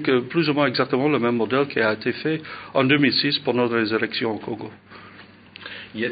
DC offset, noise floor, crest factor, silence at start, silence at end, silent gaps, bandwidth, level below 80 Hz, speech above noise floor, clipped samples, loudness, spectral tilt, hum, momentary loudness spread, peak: under 0.1%; -46 dBFS; 18 dB; 0 s; 0 s; none; 5 kHz; -66 dBFS; 25 dB; under 0.1%; -21 LUFS; -10.5 dB/octave; none; 16 LU; -4 dBFS